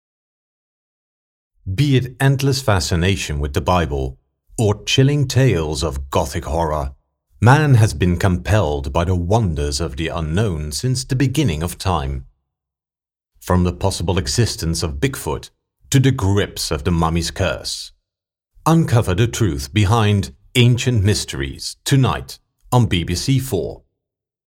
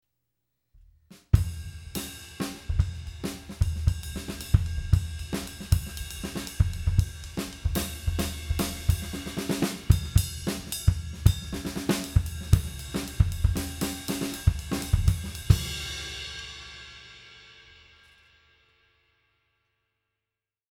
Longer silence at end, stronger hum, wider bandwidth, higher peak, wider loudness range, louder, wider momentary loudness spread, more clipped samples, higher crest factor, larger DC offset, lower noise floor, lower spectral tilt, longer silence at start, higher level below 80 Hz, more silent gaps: second, 0.7 s vs 3.1 s; neither; second, 16.5 kHz vs 18.5 kHz; first, 0 dBFS vs -4 dBFS; about the same, 4 LU vs 5 LU; first, -18 LUFS vs -29 LUFS; about the same, 10 LU vs 11 LU; neither; second, 18 dB vs 26 dB; neither; about the same, under -90 dBFS vs -89 dBFS; about the same, -5.5 dB/octave vs -5 dB/octave; first, 1.65 s vs 1.1 s; about the same, -32 dBFS vs -34 dBFS; neither